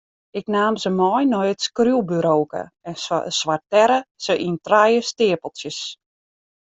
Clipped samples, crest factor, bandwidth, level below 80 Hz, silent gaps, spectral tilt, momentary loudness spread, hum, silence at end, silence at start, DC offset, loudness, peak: under 0.1%; 18 dB; 8.2 kHz; -64 dBFS; 4.11-4.15 s; -4.5 dB/octave; 13 LU; none; 0.65 s; 0.35 s; under 0.1%; -20 LUFS; -2 dBFS